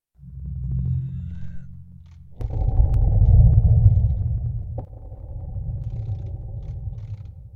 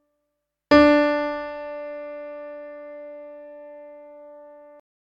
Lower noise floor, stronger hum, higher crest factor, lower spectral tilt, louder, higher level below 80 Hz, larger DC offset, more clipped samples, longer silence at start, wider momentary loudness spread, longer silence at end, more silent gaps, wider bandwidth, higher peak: second, -43 dBFS vs -79 dBFS; neither; about the same, 18 dB vs 22 dB; first, -12.5 dB/octave vs -6 dB/octave; about the same, -22 LUFS vs -20 LUFS; first, -24 dBFS vs -52 dBFS; neither; neither; second, 0.25 s vs 0.7 s; second, 22 LU vs 27 LU; second, 0.05 s vs 0.7 s; neither; second, 1.6 kHz vs 7.6 kHz; about the same, -2 dBFS vs -2 dBFS